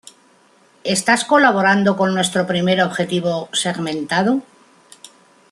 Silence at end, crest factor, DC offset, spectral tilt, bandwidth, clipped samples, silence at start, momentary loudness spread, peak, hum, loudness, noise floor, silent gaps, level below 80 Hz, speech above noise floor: 1.1 s; 16 dB; under 0.1%; -4 dB/octave; 12.5 kHz; under 0.1%; 0.85 s; 8 LU; -2 dBFS; none; -17 LUFS; -53 dBFS; none; -62 dBFS; 36 dB